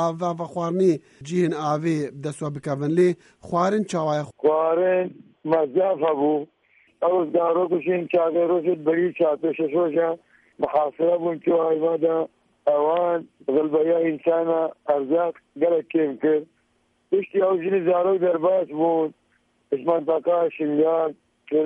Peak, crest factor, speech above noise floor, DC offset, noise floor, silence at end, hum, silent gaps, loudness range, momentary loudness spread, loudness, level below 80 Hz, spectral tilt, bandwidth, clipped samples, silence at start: -8 dBFS; 14 dB; 45 dB; under 0.1%; -67 dBFS; 0 s; none; none; 1 LU; 7 LU; -23 LUFS; -70 dBFS; -7.5 dB/octave; 11 kHz; under 0.1%; 0 s